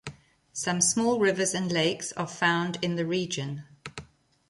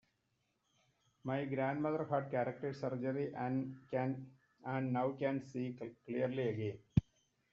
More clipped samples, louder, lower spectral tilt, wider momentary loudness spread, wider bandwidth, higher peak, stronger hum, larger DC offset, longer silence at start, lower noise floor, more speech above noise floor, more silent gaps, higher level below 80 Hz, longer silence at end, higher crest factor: neither; first, -27 LUFS vs -39 LUFS; second, -3.5 dB/octave vs -7.5 dB/octave; first, 19 LU vs 7 LU; first, 11.5 kHz vs 7.2 kHz; first, -10 dBFS vs -16 dBFS; neither; neither; second, 0.05 s vs 1.25 s; second, -52 dBFS vs -82 dBFS; second, 25 dB vs 43 dB; neither; about the same, -64 dBFS vs -64 dBFS; about the same, 0.45 s vs 0.5 s; about the same, 20 dB vs 24 dB